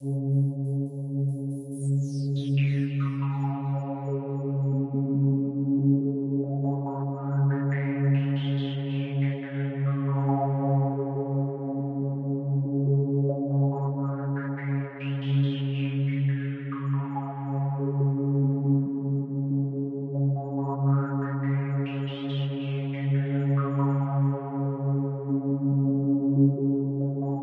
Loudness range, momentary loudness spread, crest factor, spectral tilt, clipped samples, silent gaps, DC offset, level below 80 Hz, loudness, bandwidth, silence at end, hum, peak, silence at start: 2 LU; 6 LU; 14 dB; -9.5 dB/octave; under 0.1%; none; under 0.1%; -74 dBFS; -27 LUFS; 4.2 kHz; 0 s; none; -12 dBFS; 0 s